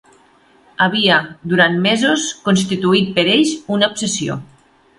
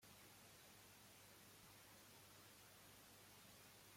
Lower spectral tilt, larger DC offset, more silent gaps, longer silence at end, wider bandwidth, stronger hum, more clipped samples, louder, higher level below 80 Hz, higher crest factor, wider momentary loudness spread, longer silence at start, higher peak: first, -4 dB/octave vs -2.5 dB/octave; neither; neither; first, 0.55 s vs 0 s; second, 11.5 kHz vs 16.5 kHz; second, none vs 50 Hz at -75 dBFS; neither; first, -15 LUFS vs -64 LUFS; first, -56 dBFS vs -84 dBFS; about the same, 16 dB vs 14 dB; first, 7 LU vs 0 LU; first, 0.8 s vs 0 s; first, 0 dBFS vs -52 dBFS